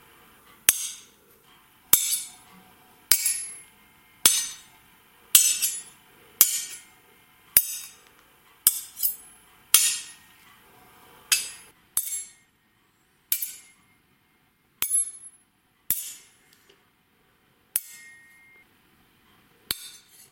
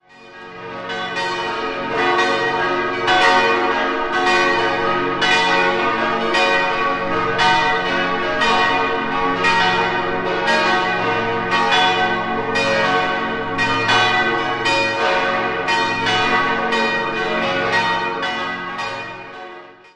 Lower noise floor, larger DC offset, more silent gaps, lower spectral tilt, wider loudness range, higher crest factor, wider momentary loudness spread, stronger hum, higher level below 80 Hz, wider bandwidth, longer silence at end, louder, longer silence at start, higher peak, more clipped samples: first, -65 dBFS vs -39 dBFS; neither; neither; second, 2.5 dB/octave vs -3.5 dB/octave; first, 12 LU vs 2 LU; first, 30 dB vs 16 dB; first, 24 LU vs 9 LU; neither; second, -66 dBFS vs -48 dBFS; first, 17 kHz vs 11 kHz; first, 0.35 s vs 0.2 s; second, -23 LUFS vs -17 LUFS; first, 0.7 s vs 0.2 s; about the same, 0 dBFS vs -2 dBFS; neither